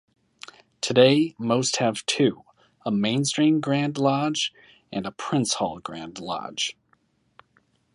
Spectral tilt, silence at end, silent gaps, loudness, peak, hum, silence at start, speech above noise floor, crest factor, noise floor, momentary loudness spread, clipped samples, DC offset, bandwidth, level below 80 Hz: -4.5 dB/octave; 1.2 s; none; -24 LUFS; -2 dBFS; none; 0.85 s; 43 dB; 22 dB; -66 dBFS; 16 LU; under 0.1%; under 0.1%; 11.5 kHz; -66 dBFS